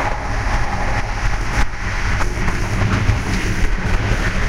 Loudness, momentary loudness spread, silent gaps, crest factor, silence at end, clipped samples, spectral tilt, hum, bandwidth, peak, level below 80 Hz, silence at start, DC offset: -21 LUFS; 4 LU; none; 14 dB; 0 s; under 0.1%; -5 dB/octave; none; 12.5 kHz; -2 dBFS; -20 dBFS; 0 s; under 0.1%